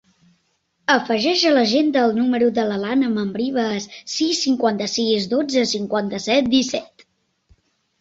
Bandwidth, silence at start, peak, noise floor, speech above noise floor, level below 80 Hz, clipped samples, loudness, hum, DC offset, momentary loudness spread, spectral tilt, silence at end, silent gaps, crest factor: 8 kHz; 0.9 s; -2 dBFS; -68 dBFS; 49 dB; -60 dBFS; under 0.1%; -19 LUFS; none; under 0.1%; 7 LU; -3.5 dB/octave; 1.15 s; none; 18 dB